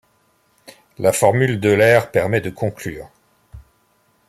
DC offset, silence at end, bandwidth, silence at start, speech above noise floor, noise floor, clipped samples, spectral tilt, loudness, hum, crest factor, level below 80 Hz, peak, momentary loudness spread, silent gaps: under 0.1%; 0.7 s; 15 kHz; 1 s; 44 dB; -61 dBFS; under 0.1%; -5.5 dB/octave; -17 LUFS; none; 18 dB; -52 dBFS; 0 dBFS; 16 LU; none